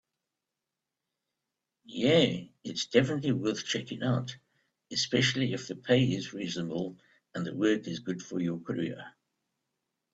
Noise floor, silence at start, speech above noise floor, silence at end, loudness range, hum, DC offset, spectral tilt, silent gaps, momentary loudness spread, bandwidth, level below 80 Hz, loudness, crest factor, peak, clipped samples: -88 dBFS; 1.9 s; 58 dB; 1.05 s; 4 LU; none; under 0.1%; -5 dB/octave; none; 12 LU; 8 kHz; -68 dBFS; -30 LUFS; 22 dB; -8 dBFS; under 0.1%